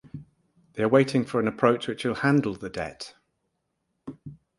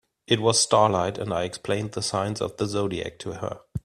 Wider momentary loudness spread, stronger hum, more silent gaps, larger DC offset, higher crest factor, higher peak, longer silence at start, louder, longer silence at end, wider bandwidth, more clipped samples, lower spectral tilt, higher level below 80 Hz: first, 23 LU vs 14 LU; neither; neither; neither; about the same, 24 dB vs 22 dB; about the same, -4 dBFS vs -4 dBFS; second, 0.15 s vs 0.3 s; about the same, -25 LUFS vs -25 LUFS; first, 0.25 s vs 0.05 s; second, 11.5 kHz vs 13.5 kHz; neither; first, -6.5 dB/octave vs -4 dB/octave; second, -60 dBFS vs -54 dBFS